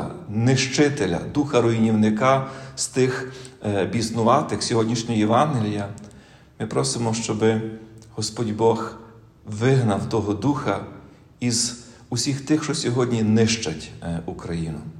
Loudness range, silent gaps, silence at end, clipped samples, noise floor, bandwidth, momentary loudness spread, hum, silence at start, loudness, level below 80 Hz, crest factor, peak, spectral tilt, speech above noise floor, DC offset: 3 LU; none; 0 s; under 0.1%; -48 dBFS; 12.5 kHz; 12 LU; none; 0 s; -22 LUFS; -54 dBFS; 18 dB; -4 dBFS; -5 dB/octave; 26 dB; under 0.1%